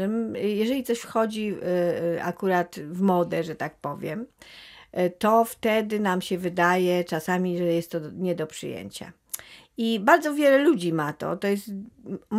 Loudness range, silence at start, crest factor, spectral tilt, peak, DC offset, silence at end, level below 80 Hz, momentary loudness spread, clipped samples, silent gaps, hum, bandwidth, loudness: 3 LU; 0 s; 22 dB; -5.5 dB/octave; -4 dBFS; under 0.1%; 0 s; -66 dBFS; 17 LU; under 0.1%; none; none; 16 kHz; -25 LUFS